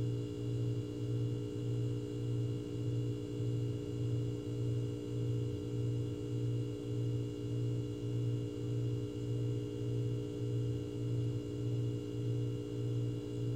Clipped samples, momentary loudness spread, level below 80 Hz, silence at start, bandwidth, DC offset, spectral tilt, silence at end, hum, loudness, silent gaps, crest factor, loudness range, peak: under 0.1%; 2 LU; -58 dBFS; 0 s; 8.8 kHz; 0.1%; -8.5 dB/octave; 0 s; none; -38 LUFS; none; 10 dB; 0 LU; -26 dBFS